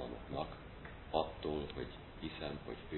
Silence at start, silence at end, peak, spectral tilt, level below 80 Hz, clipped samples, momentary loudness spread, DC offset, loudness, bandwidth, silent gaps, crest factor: 0 s; 0 s; -20 dBFS; -4.5 dB/octave; -54 dBFS; under 0.1%; 11 LU; under 0.1%; -43 LUFS; 4.2 kHz; none; 24 dB